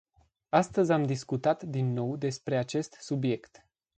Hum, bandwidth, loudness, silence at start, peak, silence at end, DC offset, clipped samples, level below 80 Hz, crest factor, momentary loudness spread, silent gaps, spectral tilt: none; 9.2 kHz; -30 LUFS; 0.55 s; -10 dBFS; 0.6 s; under 0.1%; under 0.1%; -68 dBFS; 20 dB; 7 LU; none; -6.5 dB/octave